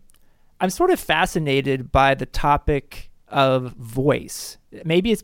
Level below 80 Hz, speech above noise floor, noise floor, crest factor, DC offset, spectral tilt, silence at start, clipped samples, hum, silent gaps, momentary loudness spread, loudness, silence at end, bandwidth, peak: -36 dBFS; 32 dB; -53 dBFS; 16 dB; under 0.1%; -5 dB/octave; 0.6 s; under 0.1%; none; none; 11 LU; -21 LUFS; 0 s; 17 kHz; -4 dBFS